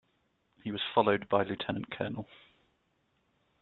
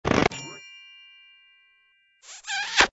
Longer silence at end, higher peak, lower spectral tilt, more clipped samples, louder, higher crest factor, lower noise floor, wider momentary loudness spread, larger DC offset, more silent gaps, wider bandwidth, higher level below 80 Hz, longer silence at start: first, 1.4 s vs 0.05 s; second, -10 dBFS vs 0 dBFS; about the same, -3.5 dB/octave vs -3 dB/octave; neither; second, -32 LUFS vs -25 LUFS; about the same, 24 dB vs 28 dB; first, -75 dBFS vs -64 dBFS; second, 15 LU vs 25 LU; neither; neither; second, 4.3 kHz vs 8 kHz; second, -68 dBFS vs -50 dBFS; first, 0.65 s vs 0.05 s